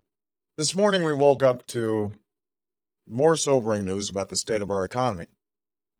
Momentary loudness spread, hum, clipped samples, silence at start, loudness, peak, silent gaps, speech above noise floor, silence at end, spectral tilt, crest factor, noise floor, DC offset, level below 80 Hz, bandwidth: 9 LU; none; under 0.1%; 0.6 s; -24 LUFS; -6 dBFS; none; over 66 dB; 0.75 s; -4.5 dB/octave; 20 dB; under -90 dBFS; under 0.1%; -62 dBFS; 16.5 kHz